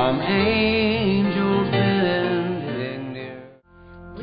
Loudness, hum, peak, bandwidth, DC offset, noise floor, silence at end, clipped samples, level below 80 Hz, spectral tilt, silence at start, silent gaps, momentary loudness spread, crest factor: -21 LUFS; none; -6 dBFS; 5.2 kHz; under 0.1%; -46 dBFS; 0 s; under 0.1%; -46 dBFS; -11 dB/octave; 0 s; none; 15 LU; 14 dB